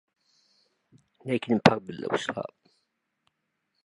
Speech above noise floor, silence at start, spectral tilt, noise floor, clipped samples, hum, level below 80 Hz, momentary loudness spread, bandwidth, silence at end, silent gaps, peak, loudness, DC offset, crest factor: 53 dB; 1.25 s; -6 dB/octave; -79 dBFS; under 0.1%; none; -64 dBFS; 17 LU; 11 kHz; 1.35 s; none; -2 dBFS; -27 LUFS; under 0.1%; 30 dB